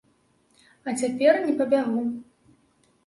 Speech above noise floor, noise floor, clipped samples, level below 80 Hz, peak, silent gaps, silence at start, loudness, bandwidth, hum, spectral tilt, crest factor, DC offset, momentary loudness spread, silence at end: 42 dB; -65 dBFS; under 0.1%; -72 dBFS; -6 dBFS; none; 0.85 s; -24 LUFS; 11.5 kHz; none; -4.5 dB/octave; 20 dB; under 0.1%; 14 LU; 0.85 s